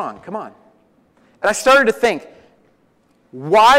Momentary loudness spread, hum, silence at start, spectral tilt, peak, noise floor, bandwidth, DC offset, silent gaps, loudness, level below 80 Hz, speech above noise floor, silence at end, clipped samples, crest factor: 18 LU; none; 0 s; -3 dB/octave; -4 dBFS; -58 dBFS; 16 kHz; under 0.1%; none; -15 LUFS; -52 dBFS; 44 dB; 0 s; under 0.1%; 14 dB